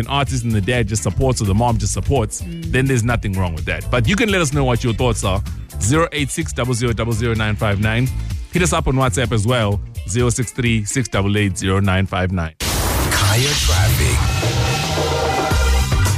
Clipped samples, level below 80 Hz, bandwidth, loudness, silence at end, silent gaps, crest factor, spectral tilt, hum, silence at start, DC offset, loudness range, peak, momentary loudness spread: under 0.1%; -26 dBFS; 15.5 kHz; -18 LUFS; 0 s; none; 12 dB; -4.5 dB/octave; none; 0 s; under 0.1%; 2 LU; -6 dBFS; 6 LU